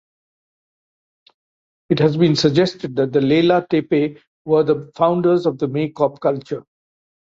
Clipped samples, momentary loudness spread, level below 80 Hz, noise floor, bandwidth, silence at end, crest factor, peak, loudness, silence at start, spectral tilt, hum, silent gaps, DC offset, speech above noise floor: under 0.1%; 8 LU; -60 dBFS; under -90 dBFS; 7.6 kHz; 0.8 s; 18 dB; -2 dBFS; -18 LUFS; 1.9 s; -7 dB/octave; none; 4.27-4.45 s; under 0.1%; over 73 dB